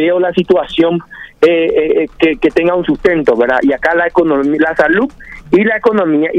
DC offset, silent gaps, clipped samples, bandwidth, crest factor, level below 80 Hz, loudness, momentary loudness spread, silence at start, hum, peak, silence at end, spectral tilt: under 0.1%; none; under 0.1%; 8 kHz; 12 dB; -40 dBFS; -12 LUFS; 4 LU; 0 s; none; 0 dBFS; 0 s; -7 dB/octave